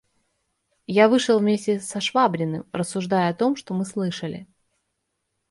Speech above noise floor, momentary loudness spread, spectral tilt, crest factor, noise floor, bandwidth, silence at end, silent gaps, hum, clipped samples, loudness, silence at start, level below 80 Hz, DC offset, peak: 55 dB; 11 LU; -5.5 dB/octave; 20 dB; -77 dBFS; 11.5 kHz; 1.05 s; none; none; under 0.1%; -22 LUFS; 0.9 s; -66 dBFS; under 0.1%; -4 dBFS